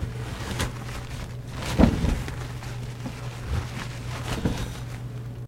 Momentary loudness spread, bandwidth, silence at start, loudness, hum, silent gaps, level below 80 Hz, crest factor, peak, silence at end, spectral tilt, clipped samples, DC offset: 14 LU; 16.5 kHz; 0 s; -30 LUFS; none; none; -34 dBFS; 22 dB; -6 dBFS; 0 s; -6 dB/octave; under 0.1%; under 0.1%